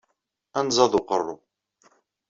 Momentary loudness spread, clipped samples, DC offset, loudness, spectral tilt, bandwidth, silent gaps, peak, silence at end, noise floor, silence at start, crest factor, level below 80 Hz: 14 LU; under 0.1%; under 0.1%; -23 LUFS; -3.5 dB/octave; 7.8 kHz; none; -4 dBFS; 0.95 s; -76 dBFS; 0.55 s; 22 dB; -62 dBFS